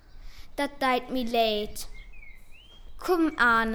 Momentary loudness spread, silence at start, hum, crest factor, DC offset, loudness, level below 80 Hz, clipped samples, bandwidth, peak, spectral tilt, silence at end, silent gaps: 17 LU; 0.15 s; none; 18 dB; under 0.1%; -26 LUFS; -46 dBFS; under 0.1%; 19.5 kHz; -10 dBFS; -3.5 dB/octave; 0 s; none